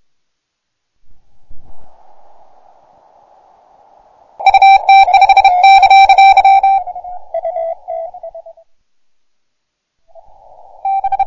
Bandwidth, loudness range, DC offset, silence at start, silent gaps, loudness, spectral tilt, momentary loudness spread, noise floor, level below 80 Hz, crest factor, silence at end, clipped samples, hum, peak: 7.4 kHz; 19 LU; under 0.1%; 1.05 s; none; -8 LUFS; 0 dB/octave; 20 LU; -73 dBFS; -46 dBFS; 12 dB; 0 s; under 0.1%; none; -2 dBFS